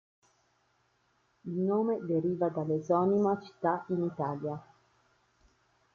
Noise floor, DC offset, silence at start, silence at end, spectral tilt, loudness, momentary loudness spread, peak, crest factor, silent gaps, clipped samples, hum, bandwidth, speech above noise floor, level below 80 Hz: -72 dBFS; under 0.1%; 1.45 s; 1.3 s; -9.5 dB/octave; -31 LUFS; 11 LU; -14 dBFS; 18 dB; none; under 0.1%; none; 7 kHz; 42 dB; -74 dBFS